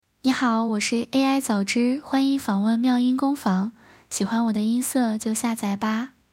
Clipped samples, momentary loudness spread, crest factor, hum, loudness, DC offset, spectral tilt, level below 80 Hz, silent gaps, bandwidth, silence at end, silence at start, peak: under 0.1%; 5 LU; 14 dB; none; -23 LUFS; under 0.1%; -4.5 dB/octave; -64 dBFS; none; 16.5 kHz; 0.25 s; 0.25 s; -8 dBFS